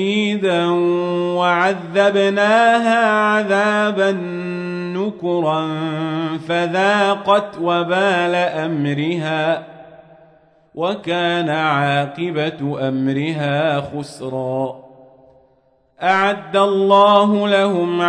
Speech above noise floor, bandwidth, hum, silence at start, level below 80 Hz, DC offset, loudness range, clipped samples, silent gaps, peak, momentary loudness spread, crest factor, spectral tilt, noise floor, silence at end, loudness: 41 dB; 10.5 kHz; none; 0 s; -64 dBFS; under 0.1%; 6 LU; under 0.1%; none; 0 dBFS; 10 LU; 16 dB; -6 dB/octave; -58 dBFS; 0 s; -17 LUFS